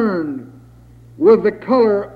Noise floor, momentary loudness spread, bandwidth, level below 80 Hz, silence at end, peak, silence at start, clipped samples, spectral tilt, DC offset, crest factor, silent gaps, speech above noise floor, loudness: -43 dBFS; 13 LU; 5 kHz; -52 dBFS; 0 s; -2 dBFS; 0 s; under 0.1%; -9 dB/octave; under 0.1%; 16 dB; none; 28 dB; -15 LUFS